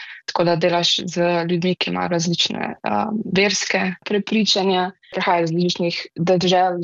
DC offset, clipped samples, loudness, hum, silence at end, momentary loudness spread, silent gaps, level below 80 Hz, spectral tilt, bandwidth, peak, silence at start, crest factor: under 0.1%; under 0.1%; -19 LUFS; none; 0 s; 7 LU; none; -60 dBFS; -4.5 dB/octave; 7.8 kHz; -6 dBFS; 0 s; 14 dB